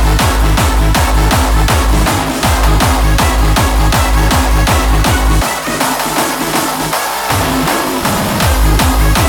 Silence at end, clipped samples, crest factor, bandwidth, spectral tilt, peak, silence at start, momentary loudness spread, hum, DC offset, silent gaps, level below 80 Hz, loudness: 0 s; under 0.1%; 10 dB; 19 kHz; -4 dB/octave; 0 dBFS; 0 s; 3 LU; none; under 0.1%; none; -14 dBFS; -12 LUFS